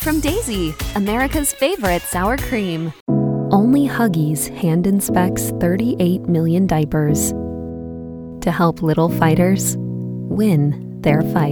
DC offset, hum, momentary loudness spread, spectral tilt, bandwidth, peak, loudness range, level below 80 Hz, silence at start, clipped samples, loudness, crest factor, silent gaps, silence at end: under 0.1%; none; 9 LU; -6 dB/octave; over 20 kHz; -2 dBFS; 2 LU; -34 dBFS; 0 s; under 0.1%; -18 LUFS; 16 dB; 3.01-3.06 s; 0 s